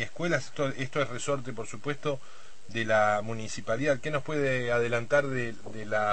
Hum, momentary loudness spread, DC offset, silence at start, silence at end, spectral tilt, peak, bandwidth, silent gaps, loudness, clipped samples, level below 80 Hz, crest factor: none; 11 LU; 2%; 0 s; 0 s; -5 dB/octave; -10 dBFS; 8.8 kHz; none; -30 LUFS; under 0.1%; -60 dBFS; 18 dB